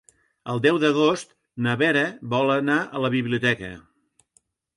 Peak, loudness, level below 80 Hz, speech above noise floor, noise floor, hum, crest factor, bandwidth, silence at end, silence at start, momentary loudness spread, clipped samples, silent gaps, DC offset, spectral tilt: -6 dBFS; -22 LUFS; -62 dBFS; 43 dB; -65 dBFS; none; 18 dB; 11.5 kHz; 0.95 s; 0.45 s; 11 LU; under 0.1%; none; under 0.1%; -5.5 dB/octave